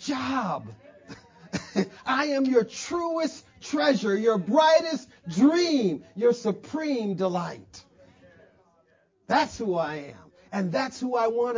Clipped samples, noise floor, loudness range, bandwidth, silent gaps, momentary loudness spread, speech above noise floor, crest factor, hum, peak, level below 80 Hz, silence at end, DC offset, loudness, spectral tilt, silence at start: under 0.1%; -65 dBFS; 7 LU; 7.6 kHz; none; 14 LU; 40 dB; 18 dB; none; -8 dBFS; -64 dBFS; 0 s; under 0.1%; -26 LUFS; -5 dB/octave; 0 s